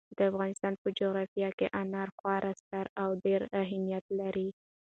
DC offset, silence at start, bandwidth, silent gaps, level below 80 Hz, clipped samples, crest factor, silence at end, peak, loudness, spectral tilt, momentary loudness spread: under 0.1%; 0.1 s; 9 kHz; 0.78-0.85 s, 1.28-1.36 s, 1.53-1.58 s, 2.12-2.24 s, 2.60-2.71 s, 2.89-2.96 s, 4.01-4.09 s; -70 dBFS; under 0.1%; 16 dB; 0.35 s; -16 dBFS; -34 LUFS; -6.5 dB/octave; 6 LU